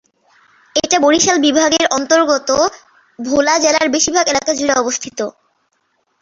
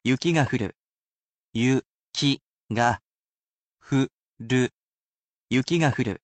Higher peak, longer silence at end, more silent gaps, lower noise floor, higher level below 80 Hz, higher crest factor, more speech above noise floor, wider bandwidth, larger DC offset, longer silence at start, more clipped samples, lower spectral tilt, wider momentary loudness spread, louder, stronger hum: first, 0 dBFS vs -8 dBFS; first, 0.9 s vs 0.05 s; second, none vs 0.76-1.49 s, 1.86-2.13 s, 2.47-2.69 s, 3.04-3.38 s, 3.44-3.77 s, 4.13-4.37 s, 4.73-5.48 s; second, -64 dBFS vs under -90 dBFS; first, -52 dBFS vs -58 dBFS; about the same, 16 dB vs 18 dB; second, 50 dB vs over 67 dB; second, 7.8 kHz vs 9 kHz; neither; first, 0.75 s vs 0.05 s; neither; second, -1.5 dB/octave vs -5.5 dB/octave; about the same, 9 LU vs 10 LU; first, -14 LUFS vs -25 LUFS; neither